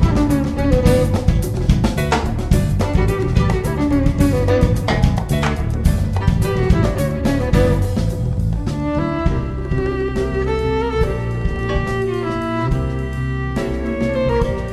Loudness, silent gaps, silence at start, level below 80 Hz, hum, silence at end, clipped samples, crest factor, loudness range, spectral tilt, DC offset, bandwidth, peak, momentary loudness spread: -18 LUFS; none; 0 s; -22 dBFS; none; 0 s; under 0.1%; 16 dB; 3 LU; -7 dB/octave; 0.6%; 14.5 kHz; 0 dBFS; 6 LU